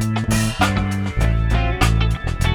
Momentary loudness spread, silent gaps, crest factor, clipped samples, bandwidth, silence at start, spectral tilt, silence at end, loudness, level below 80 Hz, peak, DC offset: 4 LU; none; 16 dB; under 0.1%; 18.5 kHz; 0 s; -5.5 dB/octave; 0 s; -19 LUFS; -22 dBFS; -2 dBFS; under 0.1%